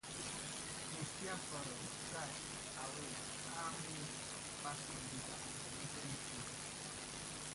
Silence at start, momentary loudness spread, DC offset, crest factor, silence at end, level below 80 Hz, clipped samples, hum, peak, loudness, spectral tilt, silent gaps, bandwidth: 0.05 s; 2 LU; under 0.1%; 16 dB; 0 s; -68 dBFS; under 0.1%; none; -32 dBFS; -45 LUFS; -2.5 dB/octave; none; 11.5 kHz